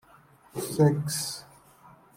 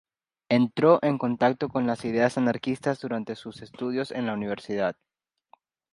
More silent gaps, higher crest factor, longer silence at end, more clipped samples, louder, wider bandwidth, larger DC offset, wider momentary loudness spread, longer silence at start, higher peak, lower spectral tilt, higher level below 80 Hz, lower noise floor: neither; about the same, 20 dB vs 20 dB; second, 0.25 s vs 1 s; neither; about the same, -27 LUFS vs -26 LUFS; first, 16.5 kHz vs 11 kHz; neither; first, 17 LU vs 11 LU; about the same, 0.55 s vs 0.5 s; about the same, -10 dBFS vs -8 dBFS; second, -5.5 dB/octave vs -7 dB/octave; about the same, -64 dBFS vs -66 dBFS; second, -57 dBFS vs -62 dBFS